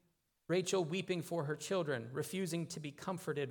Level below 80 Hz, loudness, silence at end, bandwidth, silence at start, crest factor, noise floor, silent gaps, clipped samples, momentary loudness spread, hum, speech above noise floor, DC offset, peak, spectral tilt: -82 dBFS; -39 LUFS; 0 s; 19 kHz; 0.5 s; 16 dB; -60 dBFS; none; under 0.1%; 7 LU; none; 21 dB; under 0.1%; -22 dBFS; -5 dB/octave